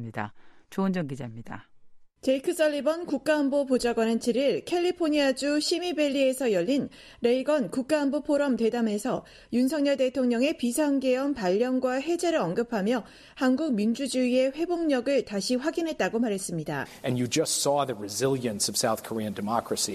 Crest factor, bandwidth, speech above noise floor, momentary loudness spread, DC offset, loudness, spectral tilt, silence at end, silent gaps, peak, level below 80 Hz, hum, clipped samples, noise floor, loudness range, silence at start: 16 dB; 14.5 kHz; 24 dB; 7 LU; under 0.1%; -27 LUFS; -4.5 dB/octave; 0 s; none; -10 dBFS; -62 dBFS; none; under 0.1%; -50 dBFS; 2 LU; 0 s